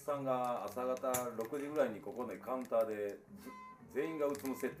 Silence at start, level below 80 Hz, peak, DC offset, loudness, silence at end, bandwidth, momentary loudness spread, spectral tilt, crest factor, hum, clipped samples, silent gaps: 0 s; -78 dBFS; -22 dBFS; under 0.1%; -39 LUFS; 0 s; 15.5 kHz; 12 LU; -5 dB/octave; 18 dB; none; under 0.1%; none